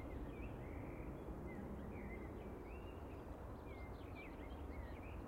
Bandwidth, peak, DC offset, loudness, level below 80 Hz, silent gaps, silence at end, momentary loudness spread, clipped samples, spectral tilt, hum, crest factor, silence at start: 16 kHz; -38 dBFS; under 0.1%; -52 LUFS; -54 dBFS; none; 0 s; 2 LU; under 0.1%; -8 dB/octave; none; 12 dB; 0 s